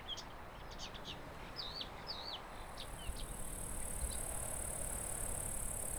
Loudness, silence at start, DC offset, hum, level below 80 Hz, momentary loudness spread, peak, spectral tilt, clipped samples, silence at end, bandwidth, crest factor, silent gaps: -44 LUFS; 0 s; under 0.1%; none; -50 dBFS; 8 LU; -28 dBFS; -2 dB/octave; under 0.1%; 0 s; over 20 kHz; 16 dB; none